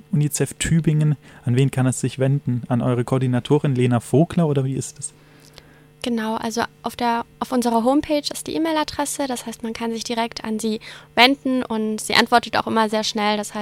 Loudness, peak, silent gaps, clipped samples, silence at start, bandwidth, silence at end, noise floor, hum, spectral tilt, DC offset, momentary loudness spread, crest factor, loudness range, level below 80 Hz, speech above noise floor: -21 LUFS; 0 dBFS; none; under 0.1%; 0.1 s; 16.5 kHz; 0 s; -47 dBFS; none; -5 dB/octave; under 0.1%; 8 LU; 20 dB; 4 LU; -50 dBFS; 27 dB